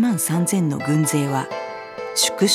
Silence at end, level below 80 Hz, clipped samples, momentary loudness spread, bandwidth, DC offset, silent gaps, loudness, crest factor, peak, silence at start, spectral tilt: 0 s; -66 dBFS; under 0.1%; 11 LU; 17.5 kHz; under 0.1%; none; -20 LUFS; 16 dB; -4 dBFS; 0 s; -4 dB/octave